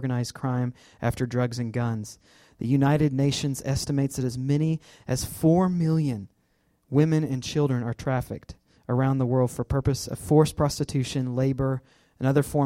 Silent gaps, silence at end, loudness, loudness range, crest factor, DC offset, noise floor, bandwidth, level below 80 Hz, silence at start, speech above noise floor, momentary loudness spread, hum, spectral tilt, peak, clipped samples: none; 0 s; -26 LUFS; 2 LU; 18 dB; under 0.1%; -68 dBFS; 16 kHz; -48 dBFS; 0 s; 43 dB; 9 LU; none; -6.5 dB/octave; -8 dBFS; under 0.1%